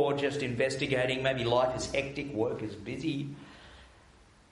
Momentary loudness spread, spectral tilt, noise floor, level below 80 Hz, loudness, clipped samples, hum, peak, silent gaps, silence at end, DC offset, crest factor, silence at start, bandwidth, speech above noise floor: 12 LU; -5 dB/octave; -59 dBFS; -56 dBFS; -31 LUFS; under 0.1%; none; -14 dBFS; none; 0.65 s; under 0.1%; 18 dB; 0 s; 11.5 kHz; 28 dB